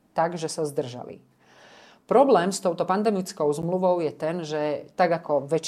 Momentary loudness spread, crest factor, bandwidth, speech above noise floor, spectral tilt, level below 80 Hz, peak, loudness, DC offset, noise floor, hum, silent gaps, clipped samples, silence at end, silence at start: 9 LU; 18 dB; 14.5 kHz; 28 dB; -5.5 dB/octave; -68 dBFS; -6 dBFS; -24 LUFS; under 0.1%; -52 dBFS; none; none; under 0.1%; 0 s; 0.15 s